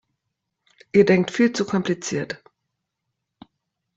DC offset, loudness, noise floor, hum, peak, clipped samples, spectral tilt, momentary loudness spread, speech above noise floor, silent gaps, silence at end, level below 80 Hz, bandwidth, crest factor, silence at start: under 0.1%; -21 LUFS; -80 dBFS; none; -4 dBFS; under 0.1%; -5.5 dB/octave; 13 LU; 60 dB; none; 1.6 s; -62 dBFS; 8 kHz; 20 dB; 0.95 s